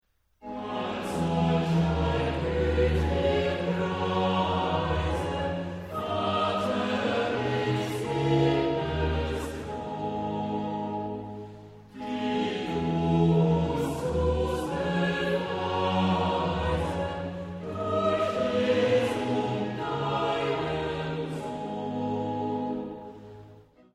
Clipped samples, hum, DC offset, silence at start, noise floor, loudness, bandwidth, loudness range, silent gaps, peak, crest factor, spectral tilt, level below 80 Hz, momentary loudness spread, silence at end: under 0.1%; none; under 0.1%; 0.45 s; -53 dBFS; -28 LUFS; 13.5 kHz; 5 LU; none; -12 dBFS; 16 dB; -7 dB/octave; -42 dBFS; 10 LU; 0.35 s